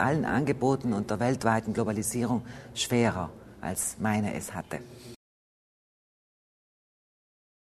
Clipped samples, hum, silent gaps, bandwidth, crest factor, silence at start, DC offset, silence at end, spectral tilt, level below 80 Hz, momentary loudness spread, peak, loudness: under 0.1%; none; none; 13.5 kHz; 22 dB; 0 s; under 0.1%; 2.65 s; -5 dB/octave; -56 dBFS; 13 LU; -10 dBFS; -29 LUFS